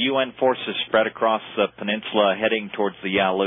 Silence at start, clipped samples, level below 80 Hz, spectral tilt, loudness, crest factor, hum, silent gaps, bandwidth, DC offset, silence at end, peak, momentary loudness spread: 0 s; under 0.1%; -62 dBFS; -9.5 dB/octave; -22 LUFS; 16 dB; none; none; 3.9 kHz; under 0.1%; 0 s; -6 dBFS; 5 LU